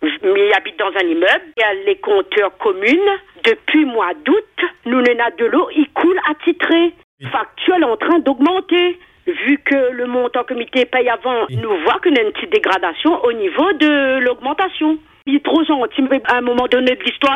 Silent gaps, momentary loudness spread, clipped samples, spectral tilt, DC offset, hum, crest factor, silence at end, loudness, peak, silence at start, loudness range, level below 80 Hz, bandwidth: 7.04-7.18 s; 6 LU; under 0.1%; -6 dB/octave; under 0.1%; none; 14 dB; 0 s; -15 LUFS; 0 dBFS; 0 s; 1 LU; -56 dBFS; 8.2 kHz